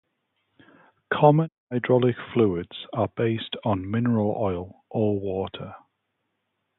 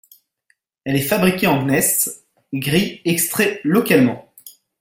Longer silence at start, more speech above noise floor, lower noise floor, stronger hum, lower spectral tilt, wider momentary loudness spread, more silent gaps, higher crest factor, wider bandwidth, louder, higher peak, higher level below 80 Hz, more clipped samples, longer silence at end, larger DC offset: first, 1.1 s vs 0.85 s; first, 54 dB vs 48 dB; first, -77 dBFS vs -65 dBFS; neither; first, -11.5 dB/octave vs -4 dB/octave; about the same, 13 LU vs 12 LU; first, 1.58-1.67 s vs none; about the same, 22 dB vs 18 dB; second, 4.1 kHz vs 17 kHz; second, -25 LUFS vs -17 LUFS; about the same, -4 dBFS vs -2 dBFS; about the same, -54 dBFS vs -52 dBFS; neither; first, 1 s vs 0.3 s; neither